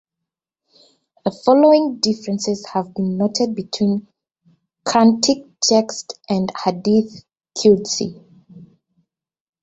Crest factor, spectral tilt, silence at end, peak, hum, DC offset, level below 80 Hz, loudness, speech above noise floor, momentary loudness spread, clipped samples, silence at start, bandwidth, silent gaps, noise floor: 18 dB; -4.5 dB/octave; 1 s; -2 dBFS; none; under 0.1%; -60 dBFS; -18 LUFS; 66 dB; 13 LU; under 0.1%; 1.25 s; 8.2 kHz; none; -83 dBFS